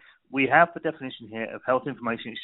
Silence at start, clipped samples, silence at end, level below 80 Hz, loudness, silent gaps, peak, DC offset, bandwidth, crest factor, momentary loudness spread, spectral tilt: 0.3 s; under 0.1%; 0 s; -68 dBFS; -25 LUFS; none; -6 dBFS; under 0.1%; 4.1 kHz; 22 dB; 15 LU; -3 dB/octave